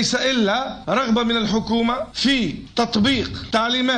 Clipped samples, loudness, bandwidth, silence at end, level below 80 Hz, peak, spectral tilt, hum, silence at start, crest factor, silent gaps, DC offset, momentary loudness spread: under 0.1%; -20 LUFS; 10.5 kHz; 0 s; -44 dBFS; -8 dBFS; -4 dB/octave; none; 0 s; 12 dB; none; under 0.1%; 4 LU